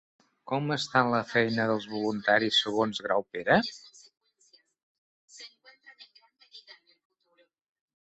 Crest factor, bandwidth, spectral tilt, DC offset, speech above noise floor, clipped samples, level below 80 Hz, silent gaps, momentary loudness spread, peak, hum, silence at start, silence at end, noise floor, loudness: 22 dB; 8.2 kHz; -4.5 dB/octave; under 0.1%; 42 dB; under 0.1%; -68 dBFS; 4.83-5.28 s; 22 LU; -8 dBFS; none; 0.45 s; 1.4 s; -69 dBFS; -27 LUFS